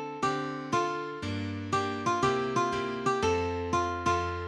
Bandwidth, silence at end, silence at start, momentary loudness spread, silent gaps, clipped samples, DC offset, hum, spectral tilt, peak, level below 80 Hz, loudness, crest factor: 12 kHz; 0 s; 0 s; 7 LU; none; under 0.1%; under 0.1%; none; -5 dB/octave; -14 dBFS; -52 dBFS; -30 LUFS; 16 dB